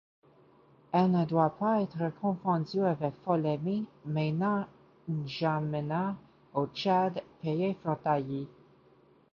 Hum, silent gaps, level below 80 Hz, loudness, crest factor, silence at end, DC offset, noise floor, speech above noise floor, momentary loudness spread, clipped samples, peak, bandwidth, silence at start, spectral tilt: none; none; -70 dBFS; -31 LUFS; 18 dB; 0.85 s; under 0.1%; -62 dBFS; 32 dB; 10 LU; under 0.1%; -12 dBFS; 6.8 kHz; 0.95 s; -9 dB/octave